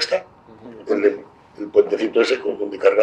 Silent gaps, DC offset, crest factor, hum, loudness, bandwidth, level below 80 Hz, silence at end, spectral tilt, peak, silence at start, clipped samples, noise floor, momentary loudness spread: none; under 0.1%; 18 dB; none; -20 LUFS; 10 kHz; -66 dBFS; 0 s; -3.5 dB/octave; -2 dBFS; 0 s; under 0.1%; -42 dBFS; 15 LU